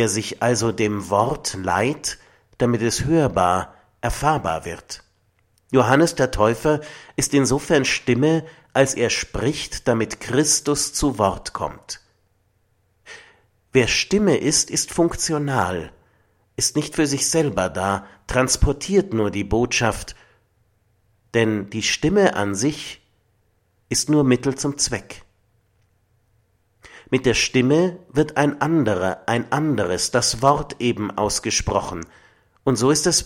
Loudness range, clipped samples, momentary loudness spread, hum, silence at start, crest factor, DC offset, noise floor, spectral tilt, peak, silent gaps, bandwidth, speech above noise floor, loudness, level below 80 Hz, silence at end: 4 LU; under 0.1%; 11 LU; none; 0 s; 20 dB; under 0.1%; -64 dBFS; -4 dB/octave; 0 dBFS; none; 16.5 kHz; 44 dB; -20 LUFS; -40 dBFS; 0 s